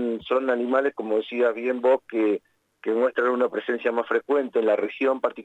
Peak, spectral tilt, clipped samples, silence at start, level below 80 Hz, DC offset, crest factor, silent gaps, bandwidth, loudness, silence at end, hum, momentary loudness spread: -8 dBFS; -6 dB/octave; under 0.1%; 0 s; -72 dBFS; under 0.1%; 14 dB; none; 8 kHz; -24 LUFS; 0 s; none; 4 LU